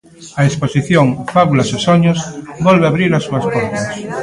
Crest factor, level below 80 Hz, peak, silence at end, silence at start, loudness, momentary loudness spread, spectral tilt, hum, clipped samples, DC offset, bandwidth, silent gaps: 14 dB; -46 dBFS; 0 dBFS; 0 s; 0.2 s; -14 LUFS; 9 LU; -6 dB/octave; none; under 0.1%; under 0.1%; 11.5 kHz; none